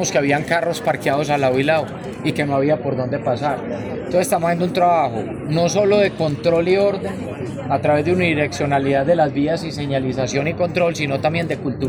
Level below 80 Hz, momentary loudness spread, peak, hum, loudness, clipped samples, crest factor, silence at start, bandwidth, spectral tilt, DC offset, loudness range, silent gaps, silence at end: -48 dBFS; 7 LU; -2 dBFS; none; -19 LUFS; under 0.1%; 16 dB; 0 s; over 20 kHz; -5.5 dB/octave; under 0.1%; 2 LU; none; 0 s